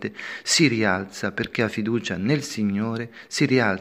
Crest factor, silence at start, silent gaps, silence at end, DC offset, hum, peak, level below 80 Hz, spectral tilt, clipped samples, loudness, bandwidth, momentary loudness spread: 18 dB; 0 s; none; 0 s; under 0.1%; none; -4 dBFS; -58 dBFS; -4 dB/octave; under 0.1%; -23 LUFS; 15.5 kHz; 11 LU